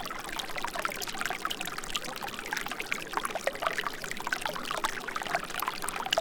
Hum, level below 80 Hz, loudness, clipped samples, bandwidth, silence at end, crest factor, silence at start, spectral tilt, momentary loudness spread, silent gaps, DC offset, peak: none; -52 dBFS; -33 LUFS; under 0.1%; 19 kHz; 0 s; 26 dB; 0 s; -1.5 dB/octave; 4 LU; none; under 0.1%; -8 dBFS